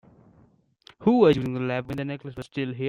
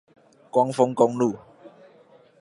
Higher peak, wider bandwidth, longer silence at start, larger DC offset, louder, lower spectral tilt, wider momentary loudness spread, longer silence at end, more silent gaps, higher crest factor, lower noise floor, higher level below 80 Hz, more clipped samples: second, -8 dBFS vs -4 dBFS; second, 10 kHz vs 11.5 kHz; first, 1 s vs 0.55 s; neither; about the same, -24 LUFS vs -22 LUFS; about the same, -8 dB/octave vs -7 dB/octave; first, 15 LU vs 6 LU; second, 0 s vs 0.75 s; neither; about the same, 18 dB vs 22 dB; first, -60 dBFS vs -54 dBFS; first, -58 dBFS vs -72 dBFS; neither